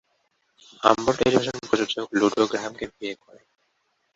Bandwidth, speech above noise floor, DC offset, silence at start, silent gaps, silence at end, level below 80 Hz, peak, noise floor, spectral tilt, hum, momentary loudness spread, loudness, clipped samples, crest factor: 8 kHz; 48 dB; under 0.1%; 0.8 s; none; 1 s; -58 dBFS; -2 dBFS; -72 dBFS; -4.5 dB/octave; none; 13 LU; -23 LUFS; under 0.1%; 24 dB